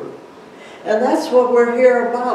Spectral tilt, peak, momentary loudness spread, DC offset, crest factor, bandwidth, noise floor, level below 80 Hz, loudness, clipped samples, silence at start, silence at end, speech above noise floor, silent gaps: -5 dB/octave; -2 dBFS; 13 LU; under 0.1%; 14 dB; 12 kHz; -39 dBFS; -72 dBFS; -15 LUFS; under 0.1%; 0 s; 0 s; 24 dB; none